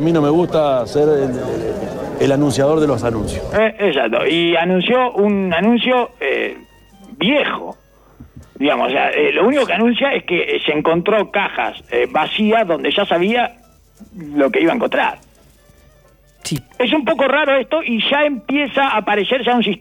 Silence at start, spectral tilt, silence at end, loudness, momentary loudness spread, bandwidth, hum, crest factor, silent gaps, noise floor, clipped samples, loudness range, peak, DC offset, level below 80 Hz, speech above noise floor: 0 s; -5.5 dB/octave; 0.05 s; -16 LUFS; 8 LU; 17.5 kHz; none; 12 dB; none; -50 dBFS; under 0.1%; 4 LU; -4 dBFS; under 0.1%; -44 dBFS; 34 dB